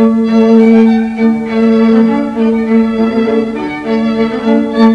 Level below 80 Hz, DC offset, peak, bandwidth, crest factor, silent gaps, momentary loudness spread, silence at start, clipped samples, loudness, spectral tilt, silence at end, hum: -44 dBFS; under 0.1%; 0 dBFS; 6.4 kHz; 10 dB; none; 7 LU; 0 s; 0.6%; -10 LUFS; -8 dB/octave; 0 s; none